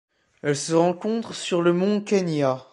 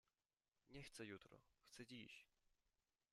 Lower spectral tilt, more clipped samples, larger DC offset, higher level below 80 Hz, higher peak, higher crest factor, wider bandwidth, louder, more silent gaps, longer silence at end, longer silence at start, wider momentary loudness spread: first, -5.5 dB/octave vs -4 dB/octave; neither; neither; first, -70 dBFS vs -82 dBFS; first, -6 dBFS vs -42 dBFS; second, 16 dB vs 22 dB; second, 11.5 kHz vs 13 kHz; first, -23 LUFS vs -60 LUFS; neither; second, 0.1 s vs 0.65 s; second, 0.45 s vs 0.65 s; about the same, 7 LU vs 8 LU